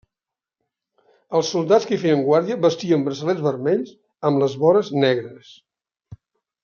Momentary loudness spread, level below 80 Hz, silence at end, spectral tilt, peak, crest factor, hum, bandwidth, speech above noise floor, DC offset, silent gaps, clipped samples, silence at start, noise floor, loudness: 7 LU; -68 dBFS; 0.5 s; -6 dB/octave; -2 dBFS; 18 dB; none; 7.2 kHz; 69 dB; under 0.1%; none; under 0.1%; 1.3 s; -88 dBFS; -20 LUFS